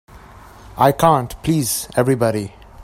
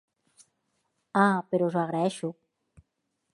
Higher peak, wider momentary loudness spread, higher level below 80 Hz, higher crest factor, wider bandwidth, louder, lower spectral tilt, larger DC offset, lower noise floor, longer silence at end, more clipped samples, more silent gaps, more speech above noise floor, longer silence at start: first, 0 dBFS vs -8 dBFS; about the same, 12 LU vs 10 LU; first, -44 dBFS vs -72 dBFS; about the same, 18 dB vs 22 dB; first, 16.5 kHz vs 11.5 kHz; first, -17 LUFS vs -27 LUFS; about the same, -5.5 dB/octave vs -6.5 dB/octave; neither; second, -41 dBFS vs -80 dBFS; second, 0 s vs 1 s; neither; neither; second, 24 dB vs 54 dB; second, 0.1 s vs 1.15 s